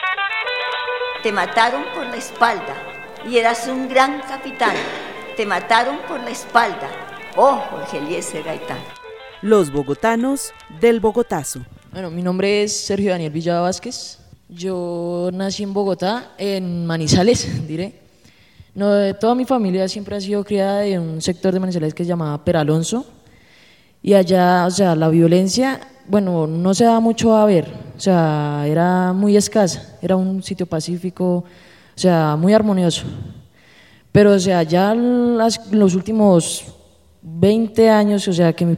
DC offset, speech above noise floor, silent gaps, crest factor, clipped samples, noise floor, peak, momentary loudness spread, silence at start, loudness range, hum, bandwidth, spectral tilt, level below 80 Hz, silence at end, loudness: 0.1%; 34 dB; none; 18 dB; under 0.1%; -51 dBFS; 0 dBFS; 13 LU; 0 s; 5 LU; none; 16 kHz; -5.5 dB/octave; -50 dBFS; 0 s; -18 LUFS